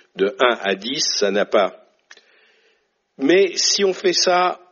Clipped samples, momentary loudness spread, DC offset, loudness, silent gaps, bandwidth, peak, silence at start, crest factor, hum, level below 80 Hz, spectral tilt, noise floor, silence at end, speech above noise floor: under 0.1%; 6 LU; under 0.1%; -18 LUFS; none; 7.4 kHz; -2 dBFS; 0.15 s; 18 dB; none; -70 dBFS; -1 dB/octave; -65 dBFS; 0.15 s; 47 dB